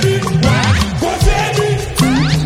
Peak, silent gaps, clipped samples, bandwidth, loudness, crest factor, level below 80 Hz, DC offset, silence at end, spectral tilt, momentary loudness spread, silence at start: 0 dBFS; none; under 0.1%; 16.5 kHz; -14 LUFS; 12 dB; -22 dBFS; under 0.1%; 0 s; -5 dB/octave; 3 LU; 0 s